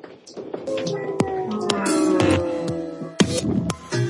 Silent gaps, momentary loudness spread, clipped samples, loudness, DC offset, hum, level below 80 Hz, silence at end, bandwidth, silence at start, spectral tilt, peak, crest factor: none; 13 LU; under 0.1%; -23 LUFS; under 0.1%; none; -52 dBFS; 0 s; 11.5 kHz; 0.05 s; -5 dB/octave; -2 dBFS; 22 dB